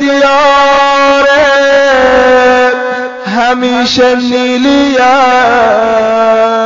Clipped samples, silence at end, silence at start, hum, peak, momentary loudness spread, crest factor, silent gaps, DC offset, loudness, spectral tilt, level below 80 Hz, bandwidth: under 0.1%; 0 s; 0 s; none; 0 dBFS; 5 LU; 6 dB; none; under 0.1%; -7 LUFS; -1 dB/octave; -38 dBFS; 7.6 kHz